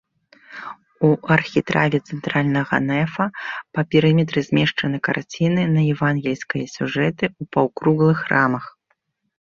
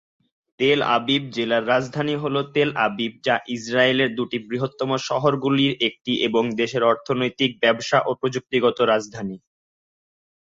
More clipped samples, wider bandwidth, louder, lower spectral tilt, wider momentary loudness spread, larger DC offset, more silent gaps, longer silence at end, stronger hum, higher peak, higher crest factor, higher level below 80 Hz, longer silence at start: neither; about the same, 7.2 kHz vs 7.8 kHz; about the same, -20 LUFS vs -21 LUFS; first, -7 dB/octave vs -5 dB/octave; first, 10 LU vs 7 LU; neither; neither; second, 0.75 s vs 1.15 s; neither; about the same, -2 dBFS vs -4 dBFS; about the same, 18 dB vs 18 dB; first, -56 dBFS vs -62 dBFS; about the same, 0.5 s vs 0.6 s